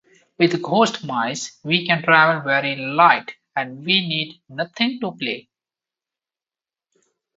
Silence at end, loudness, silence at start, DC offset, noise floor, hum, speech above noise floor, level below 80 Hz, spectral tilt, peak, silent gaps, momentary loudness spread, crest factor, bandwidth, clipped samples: 2 s; -19 LUFS; 0.4 s; under 0.1%; under -90 dBFS; none; over 70 dB; -70 dBFS; -4 dB/octave; 0 dBFS; none; 14 LU; 22 dB; 8 kHz; under 0.1%